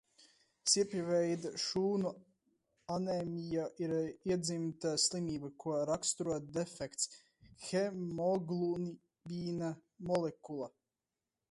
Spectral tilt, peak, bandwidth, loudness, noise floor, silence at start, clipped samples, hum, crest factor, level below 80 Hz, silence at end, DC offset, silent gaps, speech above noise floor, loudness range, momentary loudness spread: -4 dB/octave; -18 dBFS; 11.5 kHz; -37 LUFS; under -90 dBFS; 0.65 s; under 0.1%; none; 20 dB; -72 dBFS; 0.85 s; under 0.1%; none; over 53 dB; 3 LU; 12 LU